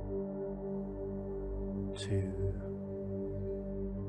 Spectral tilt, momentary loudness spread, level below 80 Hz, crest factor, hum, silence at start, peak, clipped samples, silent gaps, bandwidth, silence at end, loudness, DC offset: -8 dB/octave; 5 LU; -46 dBFS; 14 dB; 50 Hz at -50 dBFS; 0 s; -24 dBFS; under 0.1%; none; 10 kHz; 0 s; -39 LUFS; under 0.1%